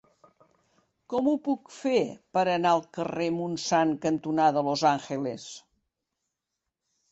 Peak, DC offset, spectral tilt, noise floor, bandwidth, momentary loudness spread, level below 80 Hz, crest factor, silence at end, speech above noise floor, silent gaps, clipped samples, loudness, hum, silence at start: -10 dBFS; under 0.1%; -5 dB/octave; -85 dBFS; 8.2 kHz; 9 LU; -70 dBFS; 18 dB; 1.55 s; 59 dB; none; under 0.1%; -27 LUFS; none; 1.1 s